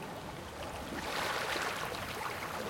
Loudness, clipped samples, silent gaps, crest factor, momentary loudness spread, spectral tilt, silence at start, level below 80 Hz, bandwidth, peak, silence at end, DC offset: -37 LUFS; under 0.1%; none; 16 dB; 9 LU; -3 dB/octave; 0 s; -58 dBFS; 17 kHz; -22 dBFS; 0 s; under 0.1%